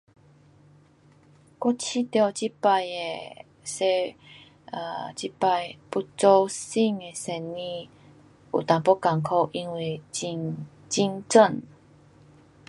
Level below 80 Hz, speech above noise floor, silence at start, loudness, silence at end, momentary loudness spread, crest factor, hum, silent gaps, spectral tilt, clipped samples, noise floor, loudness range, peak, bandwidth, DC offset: -70 dBFS; 32 dB; 1.6 s; -25 LUFS; 1.05 s; 15 LU; 24 dB; none; none; -4.5 dB/octave; under 0.1%; -57 dBFS; 3 LU; -4 dBFS; 11.5 kHz; under 0.1%